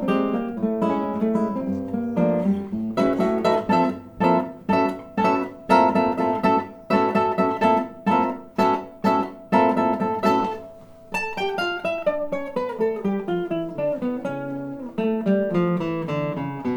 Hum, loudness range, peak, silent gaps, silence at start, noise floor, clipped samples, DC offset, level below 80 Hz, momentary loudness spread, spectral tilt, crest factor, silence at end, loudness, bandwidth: none; 5 LU; -4 dBFS; none; 0 s; -43 dBFS; under 0.1%; under 0.1%; -56 dBFS; 7 LU; -7.5 dB/octave; 18 dB; 0 s; -23 LUFS; over 20 kHz